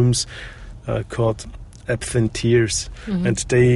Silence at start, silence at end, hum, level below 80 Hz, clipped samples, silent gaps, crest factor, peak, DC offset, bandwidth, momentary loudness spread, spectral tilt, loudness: 0 s; 0 s; none; -38 dBFS; under 0.1%; none; 16 dB; -4 dBFS; under 0.1%; 11.5 kHz; 17 LU; -5.5 dB/octave; -21 LUFS